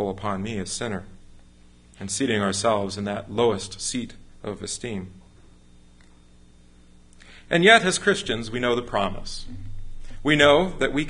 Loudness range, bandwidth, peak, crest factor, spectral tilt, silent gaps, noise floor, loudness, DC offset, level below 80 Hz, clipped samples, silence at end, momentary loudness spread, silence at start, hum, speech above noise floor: 12 LU; 11.5 kHz; 0 dBFS; 24 dB; -3.5 dB/octave; none; -51 dBFS; -22 LUFS; under 0.1%; -46 dBFS; under 0.1%; 0 s; 21 LU; 0 s; 60 Hz at -55 dBFS; 28 dB